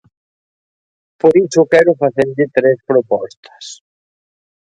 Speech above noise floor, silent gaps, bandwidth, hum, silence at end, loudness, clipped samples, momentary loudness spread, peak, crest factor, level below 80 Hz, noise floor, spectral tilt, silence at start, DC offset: over 77 dB; 3.37-3.43 s; 9.2 kHz; none; 0.95 s; -13 LUFS; under 0.1%; 21 LU; 0 dBFS; 16 dB; -58 dBFS; under -90 dBFS; -6 dB/octave; 1.25 s; under 0.1%